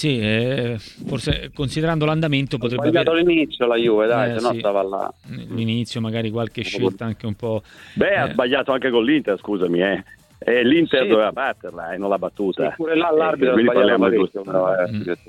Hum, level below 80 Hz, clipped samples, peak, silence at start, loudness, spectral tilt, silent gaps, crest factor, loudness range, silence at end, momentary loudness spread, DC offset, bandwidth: none; -46 dBFS; under 0.1%; -2 dBFS; 0 s; -20 LUFS; -6.5 dB/octave; none; 18 dB; 4 LU; 0.1 s; 11 LU; under 0.1%; 12 kHz